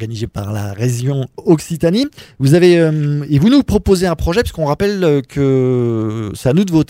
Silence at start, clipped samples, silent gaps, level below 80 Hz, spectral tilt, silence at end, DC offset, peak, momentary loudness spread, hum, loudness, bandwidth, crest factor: 0 s; under 0.1%; none; -34 dBFS; -7 dB/octave; 0.05 s; under 0.1%; 0 dBFS; 10 LU; none; -15 LUFS; 16 kHz; 14 dB